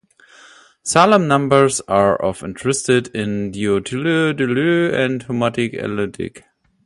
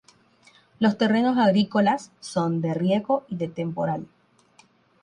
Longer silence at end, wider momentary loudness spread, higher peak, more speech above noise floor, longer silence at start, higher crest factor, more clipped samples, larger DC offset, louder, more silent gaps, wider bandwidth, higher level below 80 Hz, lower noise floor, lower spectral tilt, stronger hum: second, 0.45 s vs 1 s; about the same, 10 LU vs 10 LU; first, 0 dBFS vs -8 dBFS; second, 30 dB vs 36 dB; about the same, 0.85 s vs 0.8 s; about the same, 18 dB vs 16 dB; neither; neither; first, -17 LUFS vs -24 LUFS; neither; about the same, 11.5 kHz vs 10.5 kHz; first, -50 dBFS vs -66 dBFS; second, -47 dBFS vs -59 dBFS; second, -5 dB/octave vs -6.5 dB/octave; neither